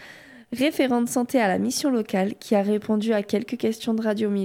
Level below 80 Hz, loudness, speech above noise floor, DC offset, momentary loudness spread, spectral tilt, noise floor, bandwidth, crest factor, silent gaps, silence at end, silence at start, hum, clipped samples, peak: -66 dBFS; -24 LUFS; 23 dB; under 0.1%; 5 LU; -5 dB/octave; -46 dBFS; 17 kHz; 14 dB; none; 0 s; 0 s; none; under 0.1%; -10 dBFS